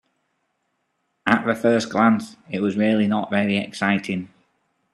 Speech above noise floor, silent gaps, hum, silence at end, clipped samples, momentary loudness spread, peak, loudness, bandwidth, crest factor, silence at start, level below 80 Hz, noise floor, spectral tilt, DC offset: 52 dB; none; none; 0.65 s; under 0.1%; 10 LU; 0 dBFS; -21 LUFS; 12 kHz; 22 dB; 1.25 s; -66 dBFS; -73 dBFS; -6 dB/octave; under 0.1%